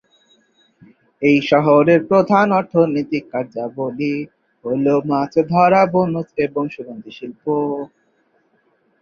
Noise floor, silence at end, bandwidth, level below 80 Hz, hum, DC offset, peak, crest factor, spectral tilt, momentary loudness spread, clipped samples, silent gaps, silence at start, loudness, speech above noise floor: -62 dBFS; 1.15 s; 6.8 kHz; -60 dBFS; none; under 0.1%; -2 dBFS; 16 dB; -8 dB/octave; 16 LU; under 0.1%; none; 1.2 s; -17 LUFS; 45 dB